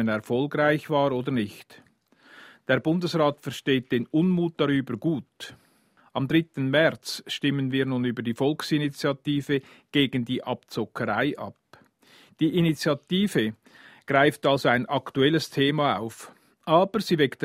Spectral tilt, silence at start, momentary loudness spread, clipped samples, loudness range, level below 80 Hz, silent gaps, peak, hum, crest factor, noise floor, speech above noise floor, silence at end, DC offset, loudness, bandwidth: -6 dB/octave; 0 s; 10 LU; under 0.1%; 4 LU; -64 dBFS; none; -6 dBFS; none; 20 dB; -61 dBFS; 37 dB; 0 s; under 0.1%; -25 LUFS; 16 kHz